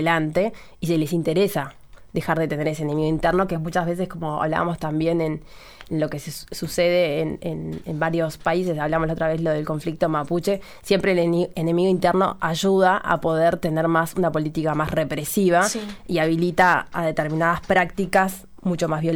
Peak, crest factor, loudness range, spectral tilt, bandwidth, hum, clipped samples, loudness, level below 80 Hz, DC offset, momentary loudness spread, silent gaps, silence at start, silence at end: -6 dBFS; 16 dB; 4 LU; -6 dB/octave; 19.5 kHz; none; under 0.1%; -22 LUFS; -46 dBFS; under 0.1%; 9 LU; none; 0 s; 0 s